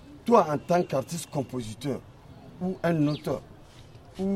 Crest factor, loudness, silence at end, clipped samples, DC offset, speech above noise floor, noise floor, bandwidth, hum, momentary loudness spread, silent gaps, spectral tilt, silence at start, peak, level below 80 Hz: 24 dB; -28 LUFS; 0 s; under 0.1%; under 0.1%; 23 dB; -49 dBFS; 16 kHz; none; 13 LU; none; -6.5 dB/octave; 0.05 s; -6 dBFS; -56 dBFS